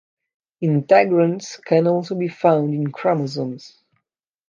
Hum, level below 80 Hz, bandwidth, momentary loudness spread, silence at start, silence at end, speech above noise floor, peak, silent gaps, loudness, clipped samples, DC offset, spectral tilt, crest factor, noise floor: none; -70 dBFS; 7.6 kHz; 12 LU; 0.6 s; 0.8 s; 60 dB; -2 dBFS; none; -19 LUFS; under 0.1%; under 0.1%; -7 dB/octave; 18 dB; -79 dBFS